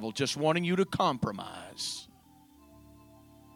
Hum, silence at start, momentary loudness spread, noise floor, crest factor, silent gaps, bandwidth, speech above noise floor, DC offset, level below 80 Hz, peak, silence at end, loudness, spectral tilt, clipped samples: none; 0 s; 14 LU; -59 dBFS; 20 dB; none; 18.5 kHz; 28 dB; under 0.1%; -64 dBFS; -12 dBFS; 0.8 s; -31 LUFS; -4.5 dB/octave; under 0.1%